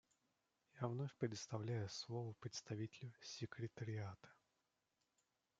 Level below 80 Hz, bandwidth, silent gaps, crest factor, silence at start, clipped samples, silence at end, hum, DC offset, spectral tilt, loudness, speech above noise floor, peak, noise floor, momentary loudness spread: -86 dBFS; 7.8 kHz; none; 22 dB; 0.75 s; under 0.1%; 1.25 s; none; under 0.1%; -5.5 dB/octave; -49 LUFS; 40 dB; -28 dBFS; -88 dBFS; 8 LU